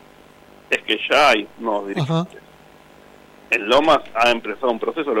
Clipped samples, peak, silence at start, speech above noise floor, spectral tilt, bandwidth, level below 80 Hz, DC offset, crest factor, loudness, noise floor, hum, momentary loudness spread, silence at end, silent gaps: under 0.1%; -6 dBFS; 0.7 s; 28 dB; -4.5 dB/octave; 16.5 kHz; -54 dBFS; under 0.1%; 16 dB; -19 LUFS; -47 dBFS; none; 9 LU; 0 s; none